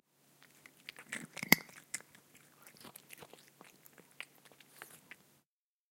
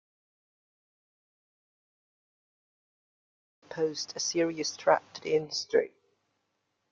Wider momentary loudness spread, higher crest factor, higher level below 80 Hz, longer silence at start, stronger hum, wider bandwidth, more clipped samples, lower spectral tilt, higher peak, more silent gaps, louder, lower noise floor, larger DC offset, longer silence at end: first, 30 LU vs 6 LU; first, 42 dB vs 26 dB; about the same, -78 dBFS vs -78 dBFS; second, 1 s vs 3.7 s; neither; first, 17 kHz vs 7.6 kHz; neither; about the same, -2 dB/octave vs -3 dB/octave; first, -2 dBFS vs -10 dBFS; neither; second, -34 LUFS vs -30 LUFS; first, -87 dBFS vs -79 dBFS; neither; about the same, 0.95 s vs 1.05 s